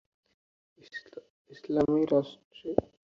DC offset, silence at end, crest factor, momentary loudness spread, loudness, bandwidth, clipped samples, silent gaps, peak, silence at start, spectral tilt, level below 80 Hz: under 0.1%; 0.35 s; 26 dB; 23 LU; -29 LUFS; 7.2 kHz; under 0.1%; 1.30-1.45 s, 2.45-2.51 s; -6 dBFS; 0.95 s; -8 dB/octave; -62 dBFS